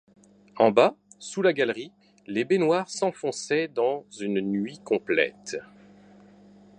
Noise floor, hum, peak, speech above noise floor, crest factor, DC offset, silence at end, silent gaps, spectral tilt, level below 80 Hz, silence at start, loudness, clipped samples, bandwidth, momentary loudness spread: -53 dBFS; 50 Hz at -50 dBFS; -6 dBFS; 28 dB; 22 dB; under 0.1%; 1.15 s; none; -4.5 dB/octave; -72 dBFS; 0.55 s; -26 LUFS; under 0.1%; 10.5 kHz; 14 LU